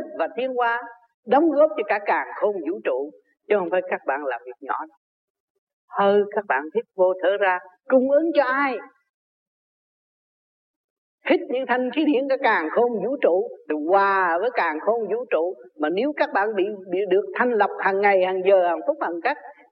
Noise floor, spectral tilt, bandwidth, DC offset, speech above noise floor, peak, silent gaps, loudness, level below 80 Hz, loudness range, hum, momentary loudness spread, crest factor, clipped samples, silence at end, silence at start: under -90 dBFS; -8.5 dB/octave; 5.6 kHz; under 0.1%; over 68 dB; -6 dBFS; 1.14-1.23 s, 4.97-5.67 s, 5.73-5.88 s, 9.09-11.18 s; -22 LUFS; -82 dBFS; 5 LU; none; 10 LU; 16 dB; under 0.1%; 0.2 s; 0 s